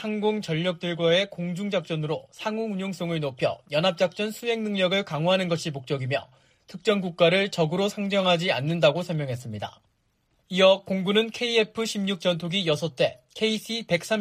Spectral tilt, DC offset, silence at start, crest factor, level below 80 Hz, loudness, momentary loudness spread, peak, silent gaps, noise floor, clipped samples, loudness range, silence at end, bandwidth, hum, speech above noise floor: -5 dB/octave; under 0.1%; 0 s; 18 dB; -68 dBFS; -25 LUFS; 9 LU; -6 dBFS; none; -70 dBFS; under 0.1%; 3 LU; 0 s; 15.5 kHz; none; 45 dB